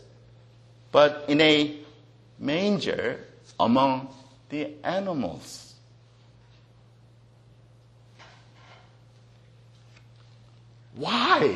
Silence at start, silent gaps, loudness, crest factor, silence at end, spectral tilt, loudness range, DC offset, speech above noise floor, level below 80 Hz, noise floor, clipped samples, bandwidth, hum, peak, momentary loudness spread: 0.95 s; none; -24 LUFS; 24 dB; 0 s; -5 dB/octave; 12 LU; under 0.1%; 31 dB; -64 dBFS; -55 dBFS; under 0.1%; 12 kHz; none; -4 dBFS; 22 LU